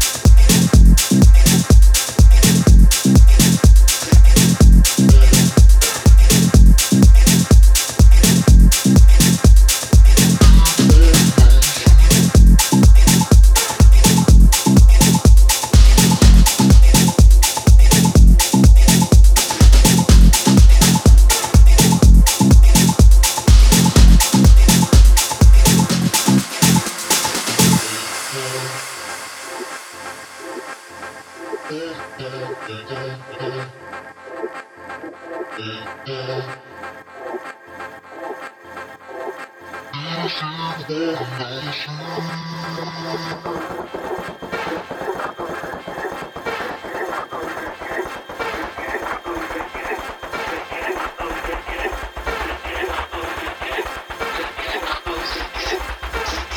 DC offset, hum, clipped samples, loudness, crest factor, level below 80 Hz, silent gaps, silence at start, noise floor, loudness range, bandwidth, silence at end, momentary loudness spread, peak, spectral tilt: under 0.1%; none; under 0.1%; -12 LUFS; 12 dB; -14 dBFS; none; 0 s; -35 dBFS; 19 LU; 17.5 kHz; 0 s; 20 LU; 0 dBFS; -4.5 dB/octave